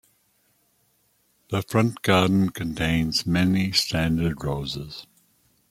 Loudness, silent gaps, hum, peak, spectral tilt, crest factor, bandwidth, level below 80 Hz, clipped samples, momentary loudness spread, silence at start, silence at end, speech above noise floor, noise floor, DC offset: -23 LUFS; none; none; -4 dBFS; -5.5 dB/octave; 22 dB; 16 kHz; -46 dBFS; under 0.1%; 10 LU; 1.5 s; 0.7 s; 43 dB; -66 dBFS; under 0.1%